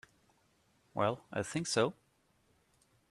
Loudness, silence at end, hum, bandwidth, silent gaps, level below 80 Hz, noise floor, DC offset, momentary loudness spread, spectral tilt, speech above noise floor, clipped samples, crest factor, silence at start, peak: -35 LUFS; 1.2 s; none; 13 kHz; none; -74 dBFS; -73 dBFS; under 0.1%; 7 LU; -4 dB/octave; 39 dB; under 0.1%; 24 dB; 0.95 s; -16 dBFS